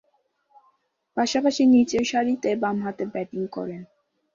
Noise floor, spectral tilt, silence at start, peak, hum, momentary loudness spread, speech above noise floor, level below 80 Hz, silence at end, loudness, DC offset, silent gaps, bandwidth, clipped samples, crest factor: -68 dBFS; -4.5 dB/octave; 1.15 s; -8 dBFS; none; 15 LU; 46 dB; -62 dBFS; 0.5 s; -23 LUFS; under 0.1%; none; 7.6 kHz; under 0.1%; 16 dB